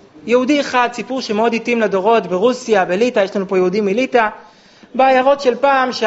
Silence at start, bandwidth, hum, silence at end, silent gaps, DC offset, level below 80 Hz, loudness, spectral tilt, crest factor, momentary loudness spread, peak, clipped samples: 0.25 s; 8 kHz; none; 0 s; none; under 0.1%; -60 dBFS; -15 LUFS; -3 dB/octave; 16 dB; 4 LU; 0 dBFS; under 0.1%